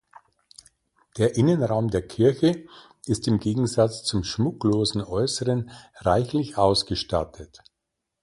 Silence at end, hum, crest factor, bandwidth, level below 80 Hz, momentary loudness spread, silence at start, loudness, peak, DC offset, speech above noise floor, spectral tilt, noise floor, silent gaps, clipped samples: 0.75 s; none; 18 dB; 11.5 kHz; -46 dBFS; 8 LU; 1.15 s; -24 LUFS; -6 dBFS; under 0.1%; 59 dB; -6 dB/octave; -82 dBFS; none; under 0.1%